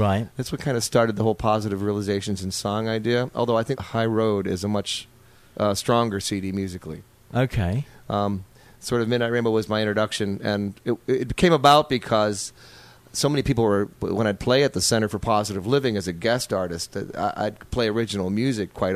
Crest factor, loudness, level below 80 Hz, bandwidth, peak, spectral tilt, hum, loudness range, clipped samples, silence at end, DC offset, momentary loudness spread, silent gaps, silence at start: 20 dB; -23 LUFS; -46 dBFS; 15.5 kHz; -2 dBFS; -5 dB/octave; none; 5 LU; under 0.1%; 0 s; under 0.1%; 9 LU; none; 0 s